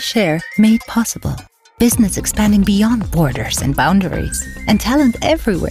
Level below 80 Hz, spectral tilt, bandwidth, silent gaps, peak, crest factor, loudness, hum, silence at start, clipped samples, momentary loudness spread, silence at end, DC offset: -30 dBFS; -5 dB/octave; 16 kHz; none; -4 dBFS; 12 dB; -15 LUFS; none; 0 s; under 0.1%; 8 LU; 0 s; under 0.1%